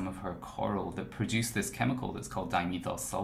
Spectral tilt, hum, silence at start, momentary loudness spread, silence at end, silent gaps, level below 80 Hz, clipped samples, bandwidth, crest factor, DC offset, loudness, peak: -4.5 dB/octave; none; 0 s; 7 LU; 0 s; none; -54 dBFS; under 0.1%; 16 kHz; 20 dB; under 0.1%; -34 LUFS; -14 dBFS